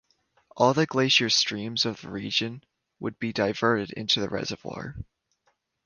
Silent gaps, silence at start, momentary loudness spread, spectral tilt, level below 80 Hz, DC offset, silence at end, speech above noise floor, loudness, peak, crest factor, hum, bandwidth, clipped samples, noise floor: none; 0.55 s; 16 LU; -3.5 dB/octave; -58 dBFS; under 0.1%; 0.8 s; 46 dB; -25 LUFS; -6 dBFS; 22 dB; none; 10.5 kHz; under 0.1%; -72 dBFS